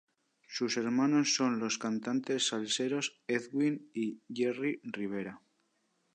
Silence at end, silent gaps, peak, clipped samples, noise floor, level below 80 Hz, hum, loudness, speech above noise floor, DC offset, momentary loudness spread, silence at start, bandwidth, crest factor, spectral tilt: 0.75 s; none; -16 dBFS; under 0.1%; -76 dBFS; -82 dBFS; none; -33 LUFS; 44 dB; under 0.1%; 10 LU; 0.5 s; 10 kHz; 16 dB; -3.5 dB/octave